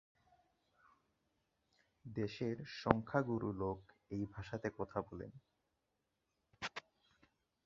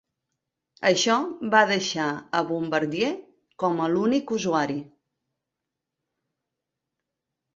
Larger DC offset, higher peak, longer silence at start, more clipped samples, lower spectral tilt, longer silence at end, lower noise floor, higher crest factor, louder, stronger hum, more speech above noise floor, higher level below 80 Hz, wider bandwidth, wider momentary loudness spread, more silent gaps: neither; second, -8 dBFS vs -4 dBFS; first, 2.05 s vs 0.8 s; neither; first, -5.5 dB/octave vs -4 dB/octave; second, 0.85 s vs 2.7 s; about the same, -86 dBFS vs -85 dBFS; first, 36 dB vs 24 dB; second, -42 LUFS vs -24 LUFS; neither; second, 46 dB vs 61 dB; about the same, -66 dBFS vs -70 dBFS; about the same, 7.2 kHz vs 7.8 kHz; first, 14 LU vs 8 LU; neither